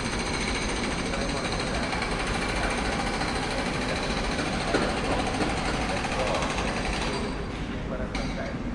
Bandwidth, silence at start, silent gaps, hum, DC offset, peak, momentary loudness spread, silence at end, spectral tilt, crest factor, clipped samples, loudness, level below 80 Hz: 11.5 kHz; 0 s; none; none; under 0.1%; -10 dBFS; 5 LU; 0 s; -4 dB/octave; 18 dB; under 0.1%; -28 LUFS; -36 dBFS